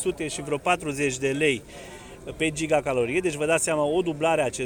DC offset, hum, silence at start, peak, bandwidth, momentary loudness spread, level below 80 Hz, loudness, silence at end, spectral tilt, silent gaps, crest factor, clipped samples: under 0.1%; none; 0 s; -10 dBFS; over 20 kHz; 15 LU; -52 dBFS; -25 LUFS; 0 s; -4 dB/octave; none; 16 dB; under 0.1%